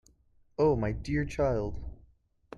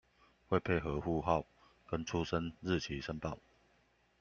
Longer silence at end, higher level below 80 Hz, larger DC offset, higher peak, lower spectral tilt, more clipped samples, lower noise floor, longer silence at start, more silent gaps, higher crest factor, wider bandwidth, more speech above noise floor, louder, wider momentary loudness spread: second, 0 s vs 0.8 s; first, -44 dBFS vs -56 dBFS; neither; about the same, -16 dBFS vs -16 dBFS; first, -8 dB/octave vs -6 dB/octave; neither; second, -64 dBFS vs -72 dBFS; about the same, 0.6 s vs 0.5 s; neither; second, 16 dB vs 22 dB; first, 11 kHz vs 7.2 kHz; about the same, 36 dB vs 36 dB; first, -30 LUFS vs -37 LUFS; first, 17 LU vs 9 LU